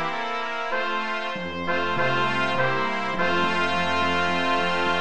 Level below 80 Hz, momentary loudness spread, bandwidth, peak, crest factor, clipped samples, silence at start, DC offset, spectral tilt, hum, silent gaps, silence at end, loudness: -56 dBFS; 5 LU; 10.5 kHz; -10 dBFS; 16 dB; under 0.1%; 0 s; 2%; -4.5 dB/octave; none; none; 0 s; -24 LUFS